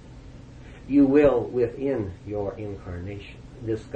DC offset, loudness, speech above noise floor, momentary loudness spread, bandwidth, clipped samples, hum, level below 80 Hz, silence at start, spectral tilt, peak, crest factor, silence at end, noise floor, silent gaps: under 0.1%; -24 LUFS; 20 dB; 26 LU; 7.6 kHz; under 0.1%; none; -46 dBFS; 0 s; -9 dB/octave; -8 dBFS; 18 dB; 0 s; -44 dBFS; none